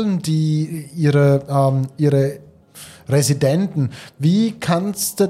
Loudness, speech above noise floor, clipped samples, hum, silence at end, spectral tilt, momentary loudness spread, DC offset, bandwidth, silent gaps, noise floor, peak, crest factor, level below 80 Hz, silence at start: -18 LUFS; 24 dB; under 0.1%; none; 0 s; -6.5 dB/octave; 9 LU; under 0.1%; 16 kHz; none; -42 dBFS; -4 dBFS; 14 dB; -58 dBFS; 0 s